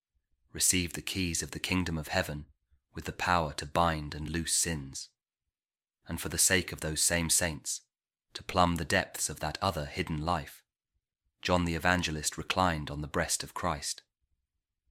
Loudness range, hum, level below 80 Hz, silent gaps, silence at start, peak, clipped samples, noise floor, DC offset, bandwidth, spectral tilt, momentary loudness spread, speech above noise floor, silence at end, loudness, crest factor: 3 LU; none; -50 dBFS; none; 0.55 s; -10 dBFS; under 0.1%; under -90 dBFS; under 0.1%; 16.5 kHz; -3 dB/octave; 15 LU; over 59 dB; 0.95 s; -30 LUFS; 24 dB